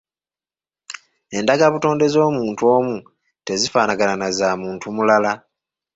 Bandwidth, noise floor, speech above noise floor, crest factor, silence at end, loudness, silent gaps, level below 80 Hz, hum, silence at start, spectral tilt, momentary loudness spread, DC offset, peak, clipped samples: 8 kHz; under -90 dBFS; over 72 dB; 18 dB; 0.6 s; -18 LUFS; none; -60 dBFS; none; 0.9 s; -4.5 dB/octave; 17 LU; under 0.1%; -2 dBFS; under 0.1%